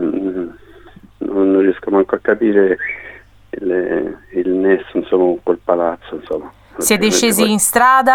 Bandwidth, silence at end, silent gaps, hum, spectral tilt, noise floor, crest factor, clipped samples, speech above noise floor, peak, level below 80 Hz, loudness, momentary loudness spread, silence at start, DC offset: 18.5 kHz; 0 s; none; none; -3.5 dB/octave; -41 dBFS; 16 dB; under 0.1%; 27 dB; 0 dBFS; -50 dBFS; -15 LUFS; 13 LU; 0 s; under 0.1%